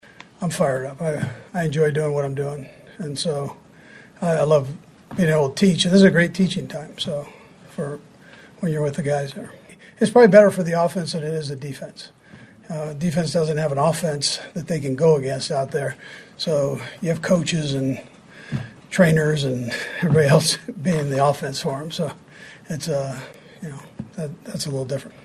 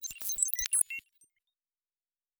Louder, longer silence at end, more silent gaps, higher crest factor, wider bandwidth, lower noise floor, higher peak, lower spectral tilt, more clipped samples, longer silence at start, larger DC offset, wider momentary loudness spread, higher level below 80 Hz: first, -21 LUFS vs -29 LUFS; second, 0.15 s vs 1.4 s; neither; second, 22 dB vs 28 dB; second, 13 kHz vs over 20 kHz; second, -46 dBFS vs under -90 dBFS; first, 0 dBFS vs -8 dBFS; first, -5.5 dB/octave vs 3.5 dB/octave; neither; first, 0.4 s vs 0 s; neither; first, 19 LU vs 8 LU; first, -56 dBFS vs -66 dBFS